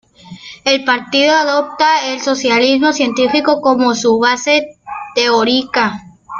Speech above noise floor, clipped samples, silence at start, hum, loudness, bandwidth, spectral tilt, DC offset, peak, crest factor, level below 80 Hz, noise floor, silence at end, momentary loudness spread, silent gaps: 22 dB; under 0.1%; 0.25 s; none; -13 LUFS; 7.6 kHz; -2.5 dB/octave; under 0.1%; 0 dBFS; 14 dB; -56 dBFS; -35 dBFS; 0 s; 8 LU; none